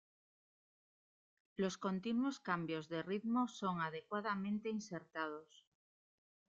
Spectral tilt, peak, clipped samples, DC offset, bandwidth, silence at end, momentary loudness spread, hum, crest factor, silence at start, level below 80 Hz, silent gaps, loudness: -5.5 dB/octave; -24 dBFS; under 0.1%; under 0.1%; 7.8 kHz; 1.05 s; 7 LU; none; 20 dB; 1.6 s; -82 dBFS; none; -41 LUFS